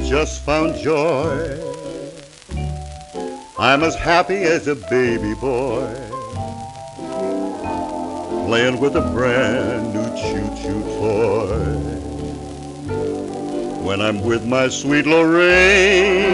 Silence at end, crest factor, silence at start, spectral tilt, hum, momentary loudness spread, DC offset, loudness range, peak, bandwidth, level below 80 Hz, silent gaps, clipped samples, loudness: 0 s; 16 dB; 0 s; -5 dB/octave; none; 16 LU; under 0.1%; 6 LU; -2 dBFS; 11.5 kHz; -36 dBFS; none; under 0.1%; -18 LUFS